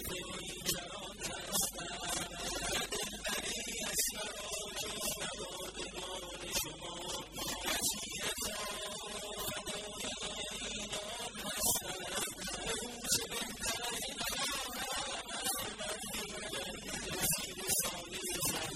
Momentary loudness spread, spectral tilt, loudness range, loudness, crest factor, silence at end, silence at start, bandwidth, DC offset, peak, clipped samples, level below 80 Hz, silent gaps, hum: 8 LU; -1 dB/octave; 2 LU; -37 LUFS; 22 dB; 0 s; 0 s; 16 kHz; under 0.1%; -16 dBFS; under 0.1%; -58 dBFS; none; none